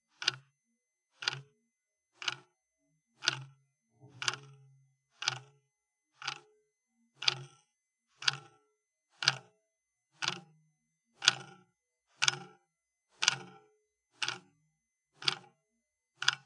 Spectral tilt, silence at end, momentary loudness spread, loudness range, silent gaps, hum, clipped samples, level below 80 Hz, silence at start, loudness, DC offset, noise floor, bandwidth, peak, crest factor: 0 dB/octave; 0.05 s; 17 LU; 6 LU; none; none; under 0.1%; under -90 dBFS; 0.2 s; -34 LUFS; under 0.1%; -85 dBFS; 11.5 kHz; -4 dBFS; 36 dB